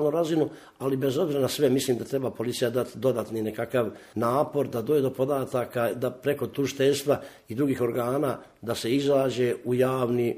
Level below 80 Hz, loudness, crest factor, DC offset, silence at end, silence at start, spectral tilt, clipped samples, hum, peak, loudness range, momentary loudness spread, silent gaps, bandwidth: -64 dBFS; -27 LUFS; 16 dB; under 0.1%; 0 s; 0 s; -6 dB/octave; under 0.1%; none; -10 dBFS; 1 LU; 7 LU; none; 15.5 kHz